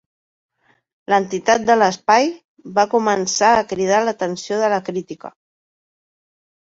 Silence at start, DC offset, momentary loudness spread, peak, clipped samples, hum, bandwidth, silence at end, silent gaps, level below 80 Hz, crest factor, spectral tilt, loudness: 1.1 s; under 0.1%; 13 LU; -2 dBFS; under 0.1%; none; 8 kHz; 1.4 s; 2.45-2.57 s; -60 dBFS; 18 dB; -3.5 dB/octave; -17 LUFS